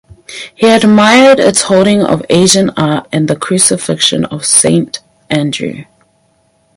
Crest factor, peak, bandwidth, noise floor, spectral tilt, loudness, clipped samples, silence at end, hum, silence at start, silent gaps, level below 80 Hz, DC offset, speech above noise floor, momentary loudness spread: 10 dB; 0 dBFS; 16 kHz; -54 dBFS; -3.5 dB/octave; -9 LUFS; 0.6%; 0.95 s; none; 0.3 s; none; -48 dBFS; under 0.1%; 45 dB; 16 LU